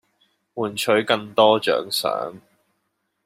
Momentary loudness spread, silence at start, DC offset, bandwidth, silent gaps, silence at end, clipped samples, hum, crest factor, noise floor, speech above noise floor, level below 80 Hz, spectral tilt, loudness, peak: 12 LU; 0.55 s; under 0.1%; 16 kHz; none; 0.9 s; under 0.1%; none; 20 dB; -74 dBFS; 53 dB; -68 dBFS; -3.5 dB/octave; -20 LUFS; -2 dBFS